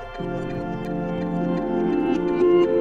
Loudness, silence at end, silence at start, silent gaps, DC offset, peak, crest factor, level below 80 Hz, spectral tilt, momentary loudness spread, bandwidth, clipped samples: -23 LUFS; 0 s; 0 s; none; under 0.1%; -8 dBFS; 14 dB; -44 dBFS; -8.5 dB/octave; 11 LU; 6.4 kHz; under 0.1%